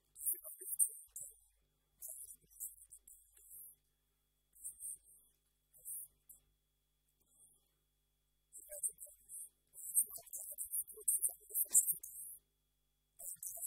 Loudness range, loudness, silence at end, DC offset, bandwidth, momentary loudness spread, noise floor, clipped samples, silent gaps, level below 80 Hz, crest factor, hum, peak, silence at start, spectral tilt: 17 LU; -39 LUFS; 0 s; under 0.1%; 16 kHz; 20 LU; -83 dBFS; under 0.1%; none; -82 dBFS; 28 dB; none; -16 dBFS; 0.15 s; 1 dB/octave